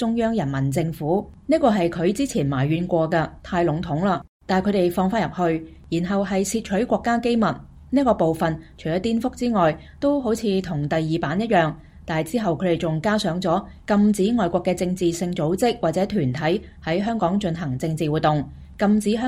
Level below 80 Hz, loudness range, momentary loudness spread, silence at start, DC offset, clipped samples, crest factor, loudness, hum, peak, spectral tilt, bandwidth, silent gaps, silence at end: -46 dBFS; 1 LU; 6 LU; 0 s; under 0.1%; under 0.1%; 16 dB; -22 LUFS; none; -6 dBFS; -6.5 dB/octave; 15.5 kHz; 4.29-4.40 s; 0 s